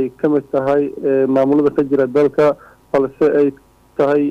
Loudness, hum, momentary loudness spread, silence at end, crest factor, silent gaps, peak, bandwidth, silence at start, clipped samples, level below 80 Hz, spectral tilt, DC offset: -16 LUFS; none; 5 LU; 0 s; 10 dB; none; -6 dBFS; 7.2 kHz; 0 s; under 0.1%; -54 dBFS; -8.5 dB/octave; under 0.1%